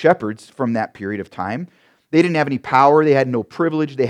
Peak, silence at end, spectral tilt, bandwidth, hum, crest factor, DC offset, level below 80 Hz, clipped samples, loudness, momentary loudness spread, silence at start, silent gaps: 0 dBFS; 0 s; -7.5 dB/octave; 10.5 kHz; none; 18 dB; under 0.1%; -64 dBFS; under 0.1%; -18 LUFS; 14 LU; 0 s; none